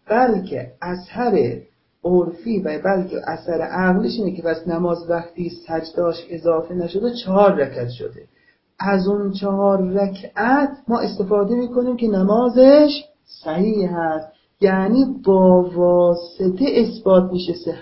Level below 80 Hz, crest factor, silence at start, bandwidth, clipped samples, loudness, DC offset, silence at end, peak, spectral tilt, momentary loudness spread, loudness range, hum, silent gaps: -52 dBFS; 18 dB; 0.1 s; 5.8 kHz; under 0.1%; -18 LUFS; under 0.1%; 0 s; 0 dBFS; -11.5 dB/octave; 12 LU; 5 LU; none; none